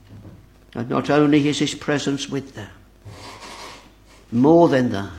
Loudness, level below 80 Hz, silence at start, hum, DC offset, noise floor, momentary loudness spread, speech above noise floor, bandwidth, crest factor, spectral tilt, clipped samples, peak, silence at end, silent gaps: -19 LUFS; -52 dBFS; 0.1 s; none; under 0.1%; -48 dBFS; 24 LU; 30 dB; 12 kHz; 18 dB; -6 dB/octave; under 0.1%; -2 dBFS; 0 s; none